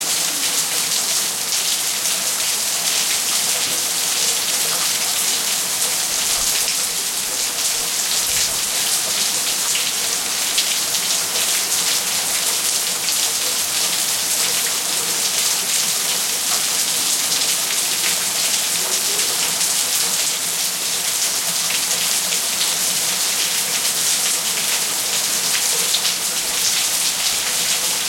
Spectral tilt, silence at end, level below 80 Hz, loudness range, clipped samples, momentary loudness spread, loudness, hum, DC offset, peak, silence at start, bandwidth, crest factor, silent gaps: 1.5 dB/octave; 0 s; -58 dBFS; 1 LU; under 0.1%; 2 LU; -16 LUFS; none; under 0.1%; -2 dBFS; 0 s; 16.5 kHz; 18 dB; none